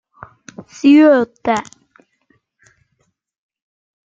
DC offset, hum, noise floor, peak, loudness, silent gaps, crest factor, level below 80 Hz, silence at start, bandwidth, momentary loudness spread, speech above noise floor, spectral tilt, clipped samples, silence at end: under 0.1%; none; -67 dBFS; -2 dBFS; -13 LUFS; none; 16 dB; -62 dBFS; 0.85 s; 7.6 kHz; 24 LU; 55 dB; -5 dB/octave; under 0.1%; 2.5 s